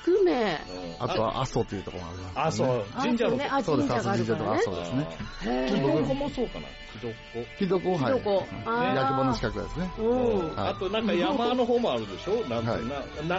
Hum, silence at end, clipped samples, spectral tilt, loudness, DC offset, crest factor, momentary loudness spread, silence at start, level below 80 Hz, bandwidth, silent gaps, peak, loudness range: none; 0 s; under 0.1%; -5 dB/octave; -28 LUFS; under 0.1%; 12 dB; 10 LU; 0 s; -46 dBFS; 8 kHz; none; -16 dBFS; 2 LU